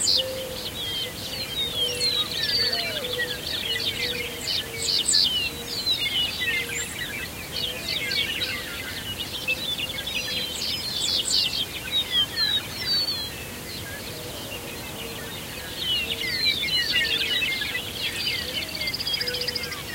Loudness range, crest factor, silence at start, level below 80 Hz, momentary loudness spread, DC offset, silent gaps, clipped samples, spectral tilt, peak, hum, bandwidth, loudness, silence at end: 4 LU; 20 dB; 0 s; -50 dBFS; 12 LU; under 0.1%; none; under 0.1%; -1 dB/octave; -8 dBFS; none; 16 kHz; -24 LUFS; 0 s